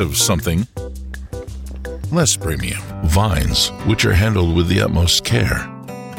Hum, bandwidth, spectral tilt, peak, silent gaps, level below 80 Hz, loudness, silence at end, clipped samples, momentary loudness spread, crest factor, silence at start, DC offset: none; 17 kHz; -4 dB/octave; -4 dBFS; none; -28 dBFS; -17 LUFS; 0 s; under 0.1%; 16 LU; 14 dB; 0 s; under 0.1%